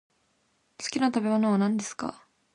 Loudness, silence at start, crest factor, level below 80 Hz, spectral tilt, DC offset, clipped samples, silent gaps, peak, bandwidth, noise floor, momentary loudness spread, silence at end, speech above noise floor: -27 LUFS; 0.8 s; 16 dB; -70 dBFS; -5 dB/octave; under 0.1%; under 0.1%; none; -12 dBFS; 11 kHz; -71 dBFS; 12 LU; 0.4 s; 45 dB